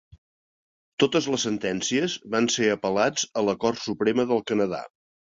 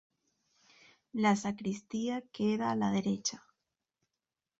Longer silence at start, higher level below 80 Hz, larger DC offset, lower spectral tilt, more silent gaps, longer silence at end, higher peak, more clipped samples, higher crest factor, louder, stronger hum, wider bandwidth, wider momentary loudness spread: second, 1 s vs 1.15 s; first, -62 dBFS vs -72 dBFS; neither; second, -3.5 dB/octave vs -5 dB/octave; neither; second, 0.45 s vs 1.2 s; first, -6 dBFS vs -16 dBFS; neither; about the same, 20 dB vs 18 dB; first, -24 LUFS vs -33 LUFS; neither; about the same, 7.8 kHz vs 8 kHz; second, 4 LU vs 8 LU